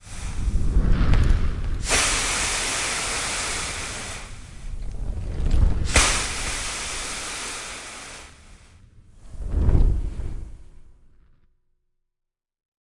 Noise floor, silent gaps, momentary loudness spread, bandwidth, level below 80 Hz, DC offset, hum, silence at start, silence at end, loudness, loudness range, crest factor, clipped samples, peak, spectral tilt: -83 dBFS; none; 18 LU; 11.5 kHz; -26 dBFS; under 0.1%; none; 0.05 s; 2.05 s; -24 LUFS; 7 LU; 22 dB; under 0.1%; -2 dBFS; -3 dB/octave